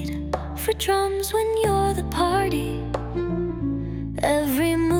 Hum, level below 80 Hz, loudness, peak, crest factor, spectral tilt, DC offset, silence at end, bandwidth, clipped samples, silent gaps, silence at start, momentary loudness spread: none; -36 dBFS; -24 LUFS; -8 dBFS; 16 dB; -5.5 dB/octave; under 0.1%; 0 s; 19 kHz; under 0.1%; none; 0 s; 7 LU